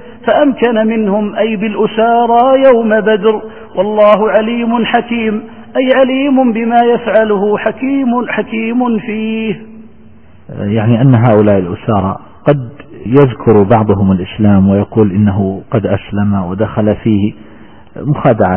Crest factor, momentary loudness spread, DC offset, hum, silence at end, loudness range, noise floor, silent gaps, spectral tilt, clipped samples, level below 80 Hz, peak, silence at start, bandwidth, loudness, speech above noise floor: 10 dB; 9 LU; 1%; none; 0 s; 4 LU; -41 dBFS; none; -11 dB/octave; under 0.1%; -42 dBFS; 0 dBFS; 0 s; 3.6 kHz; -11 LUFS; 30 dB